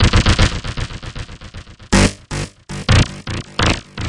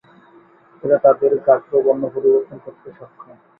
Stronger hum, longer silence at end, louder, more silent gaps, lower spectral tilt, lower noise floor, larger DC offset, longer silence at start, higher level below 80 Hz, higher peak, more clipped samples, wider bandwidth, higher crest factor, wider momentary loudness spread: neither; second, 0 s vs 0.55 s; about the same, -17 LUFS vs -17 LUFS; neither; second, -4.5 dB/octave vs -12 dB/octave; second, -35 dBFS vs -49 dBFS; neither; second, 0 s vs 0.85 s; first, -24 dBFS vs -64 dBFS; about the same, 0 dBFS vs -2 dBFS; neither; first, 11.5 kHz vs 2.6 kHz; about the same, 18 dB vs 18 dB; about the same, 18 LU vs 19 LU